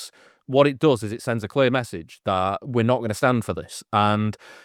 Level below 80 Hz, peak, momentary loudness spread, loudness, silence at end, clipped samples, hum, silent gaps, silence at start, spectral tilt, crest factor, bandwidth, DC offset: -58 dBFS; -2 dBFS; 11 LU; -22 LUFS; 0.1 s; under 0.1%; none; none; 0 s; -6 dB/octave; 20 dB; 15.5 kHz; under 0.1%